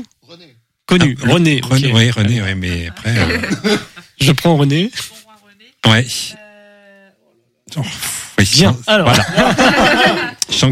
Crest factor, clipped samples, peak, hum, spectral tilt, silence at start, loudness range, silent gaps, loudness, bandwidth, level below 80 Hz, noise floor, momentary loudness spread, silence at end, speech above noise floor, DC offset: 14 dB; under 0.1%; 0 dBFS; none; -4.5 dB/octave; 0 s; 6 LU; none; -13 LUFS; 16 kHz; -40 dBFS; -59 dBFS; 11 LU; 0 s; 46 dB; under 0.1%